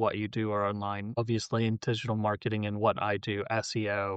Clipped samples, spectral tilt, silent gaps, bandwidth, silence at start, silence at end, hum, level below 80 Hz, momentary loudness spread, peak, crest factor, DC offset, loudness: under 0.1%; -6 dB/octave; none; 8.8 kHz; 0 s; 0 s; none; -66 dBFS; 4 LU; -14 dBFS; 16 dB; under 0.1%; -31 LUFS